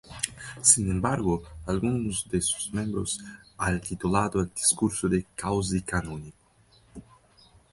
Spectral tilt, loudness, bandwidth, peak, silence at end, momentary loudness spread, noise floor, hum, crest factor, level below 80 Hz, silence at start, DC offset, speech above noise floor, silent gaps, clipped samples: -4 dB/octave; -26 LUFS; 12 kHz; -4 dBFS; 0.7 s; 11 LU; -60 dBFS; none; 24 dB; -46 dBFS; 0.05 s; under 0.1%; 33 dB; none; under 0.1%